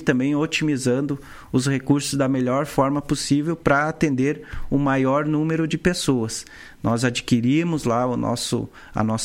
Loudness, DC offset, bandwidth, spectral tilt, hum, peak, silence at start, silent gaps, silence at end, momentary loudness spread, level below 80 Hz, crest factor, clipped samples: -22 LUFS; under 0.1%; 16.5 kHz; -5.5 dB/octave; none; -2 dBFS; 0 s; none; 0 s; 6 LU; -44 dBFS; 18 dB; under 0.1%